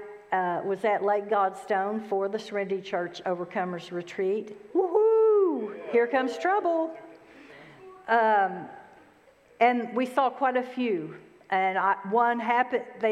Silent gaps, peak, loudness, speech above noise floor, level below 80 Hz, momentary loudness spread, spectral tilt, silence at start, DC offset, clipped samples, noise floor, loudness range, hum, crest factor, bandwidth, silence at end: none; -8 dBFS; -27 LUFS; 32 dB; -78 dBFS; 10 LU; -6 dB/octave; 0 s; under 0.1%; under 0.1%; -58 dBFS; 4 LU; none; 18 dB; 11 kHz; 0 s